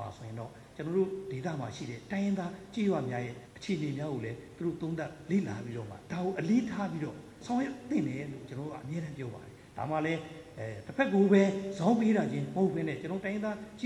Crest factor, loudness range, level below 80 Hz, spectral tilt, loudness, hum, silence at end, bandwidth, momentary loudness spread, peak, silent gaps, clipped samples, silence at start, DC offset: 20 dB; 7 LU; -66 dBFS; -7 dB/octave; -33 LUFS; none; 0 s; 11.5 kHz; 15 LU; -12 dBFS; none; under 0.1%; 0 s; under 0.1%